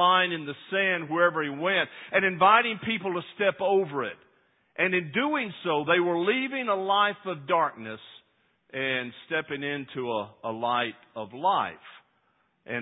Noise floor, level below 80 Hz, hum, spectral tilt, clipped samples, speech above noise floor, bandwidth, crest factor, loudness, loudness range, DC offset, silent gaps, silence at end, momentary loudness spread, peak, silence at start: -70 dBFS; -74 dBFS; none; -9 dB/octave; under 0.1%; 43 dB; 4 kHz; 22 dB; -26 LUFS; 7 LU; under 0.1%; none; 0 s; 12 LU; -6 dBFS; 0 s